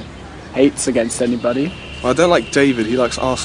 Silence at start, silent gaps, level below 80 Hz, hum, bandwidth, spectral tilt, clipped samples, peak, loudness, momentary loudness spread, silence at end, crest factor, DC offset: 0 s; none; -40 dBFS; none; 10.5 kHz; -4.5 dB/octave; under 0.1%; 0 dBFS; -17 LUFS; 10 LU; 0 s; 16 dB; under 0.1%